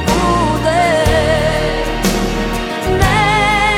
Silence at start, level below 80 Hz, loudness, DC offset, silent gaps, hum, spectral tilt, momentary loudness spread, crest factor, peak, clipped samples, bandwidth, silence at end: 0 s; -24 dBFS; -14 LUFS; under 0.1%; none; none; -4.5 dB/octave; 6 LU; 12 dB; -2 dBFS; under 0.1%; 17 kHz; 0 s